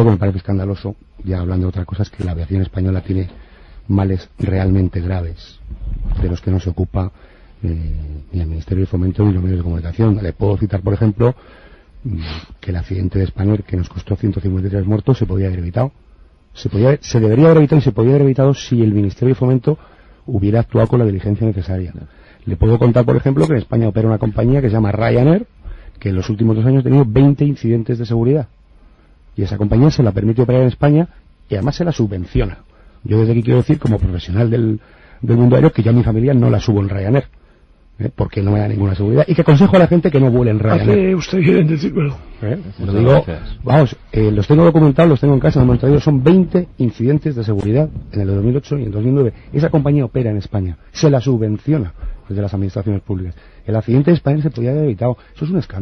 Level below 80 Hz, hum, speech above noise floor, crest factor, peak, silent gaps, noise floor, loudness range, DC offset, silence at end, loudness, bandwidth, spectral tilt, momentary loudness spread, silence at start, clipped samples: -32 dBFS; none; 33 dB; 14 dB; 0 dBFS; none; -48 dBFS; 7 LU; under 0.1%; 0 s; -15 LUFS; 6.4 kHz; -9 dB/octave; 13 LU; 0 s; under 0.1%